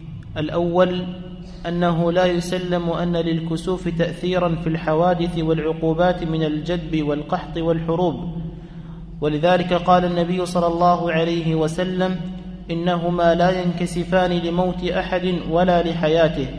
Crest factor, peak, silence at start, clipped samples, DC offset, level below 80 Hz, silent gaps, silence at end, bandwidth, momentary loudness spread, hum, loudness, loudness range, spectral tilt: 18 dB; -2 dBFS; 0 s; under 0.1%; under 0.1%; -38 dBFS; none; 0 s; 11 kHz; 11 LU; none; -20 LUFS; 3 LU; -7 dB/octave